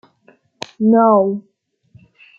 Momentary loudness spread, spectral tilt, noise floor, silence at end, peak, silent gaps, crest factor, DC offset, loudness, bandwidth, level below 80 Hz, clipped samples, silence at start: 22 LU; -7.5 dB/octave; -54 dBFS; 1 s; -2 dBFS; none; 16 dB; under 0.1%; -14 LUFS; 7.2 kHz; -66 dBFS; under 0.1%; 0.8 s